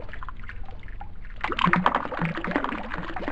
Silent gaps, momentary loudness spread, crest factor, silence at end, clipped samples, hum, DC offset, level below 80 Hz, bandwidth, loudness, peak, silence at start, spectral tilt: none; 21 LU; 24 dB; 0 s; under 0.1%; none; 1%; -38 dBFS; 8.4 kHz; -26 LUFS; -4 dBFS; 0 s; -6.5 dB/octave